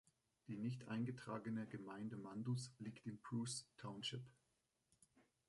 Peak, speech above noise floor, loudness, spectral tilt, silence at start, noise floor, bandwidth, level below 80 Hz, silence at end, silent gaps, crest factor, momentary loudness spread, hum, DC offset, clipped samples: -34 dBFS; 38 dB; -49 LUFS; -5 dB/octave; 0.5 s; -86 dBFS; 11.5 kHz; -84 dBFS; 0.25 s; none; 16 dB; 9 LU; none; under 0.1%; under 0.1%